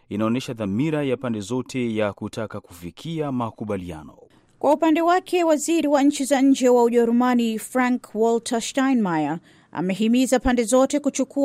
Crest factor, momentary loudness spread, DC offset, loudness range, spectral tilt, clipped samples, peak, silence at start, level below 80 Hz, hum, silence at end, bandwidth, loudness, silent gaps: 14 dB; 12 LU; under 0.1%; 8 LU; -5 dB/octave; under 0.1%; -8 dBFS; 0.1 s; -50 dBFS; none; 0 s; 16 kHz; -21 LUFS; none